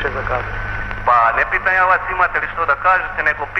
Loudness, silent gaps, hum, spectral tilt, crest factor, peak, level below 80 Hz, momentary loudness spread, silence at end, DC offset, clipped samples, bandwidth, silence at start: -16 LUFS; none; none; -6 dB/octave; 14 dB; -4 dBFS; -32 dBFS; 9 LU; 0 s; under 0.1%; under 0.1%; 8.4 kHz; 0 s